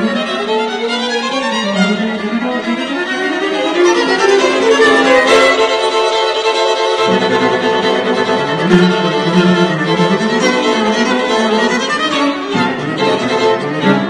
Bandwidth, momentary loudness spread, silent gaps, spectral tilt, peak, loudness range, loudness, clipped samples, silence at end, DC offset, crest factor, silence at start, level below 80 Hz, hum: 10.5 kHz; 7 LU; none; -4.5 dB/octave; 0 dBFS; 4 LU; -13 LUFS; under 0.1%; 0 s; under 0.1%; 12 dB; 0 s; -52 dBFS; none